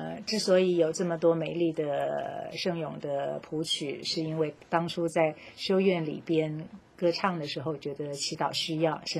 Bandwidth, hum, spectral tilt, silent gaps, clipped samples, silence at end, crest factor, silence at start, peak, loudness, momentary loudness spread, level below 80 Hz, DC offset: 15 kHz; none; -5 dB/octave; none; under 0.1%; 0 s; 20 dB; 0 s; -10 dBFS; -29 LUFS; 9 LU; -70 dBFS; under 0.1%